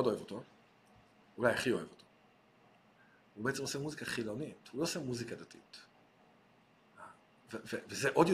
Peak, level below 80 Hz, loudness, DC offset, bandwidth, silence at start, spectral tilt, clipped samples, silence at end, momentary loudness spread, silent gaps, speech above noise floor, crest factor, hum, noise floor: -14 dBFS; -74 dBFS; -38 LUFS; under 0.1%; 15 kHz; 0 s; -4.5 dB/octave; under 0.1%; 0 s; 22 LU; none; 31 dB; 26 dB; none; -67 dBFS